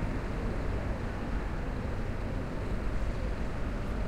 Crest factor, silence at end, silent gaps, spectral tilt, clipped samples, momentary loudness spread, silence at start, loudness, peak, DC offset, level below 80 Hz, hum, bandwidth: 12 dB; 0 s; none; -7.5 dB/octave; under 0.1%; 1 LU; 0 s; -36 LUFS; -20 dBFS; under 0.1%; -36 dBFS; none; 10.5 kHz